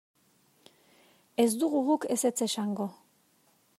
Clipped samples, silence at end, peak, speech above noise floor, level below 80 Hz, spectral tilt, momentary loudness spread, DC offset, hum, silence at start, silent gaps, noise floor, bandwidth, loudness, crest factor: under 0.1%; 0.85 s; -12 dBFS; 39 dB; -84 dBFS; -4 dB/octave; 10 LU; under 0.1%; none; 1.4 s; none; -67 dBFS; 16 kHz; -29 LUFS; 20 dB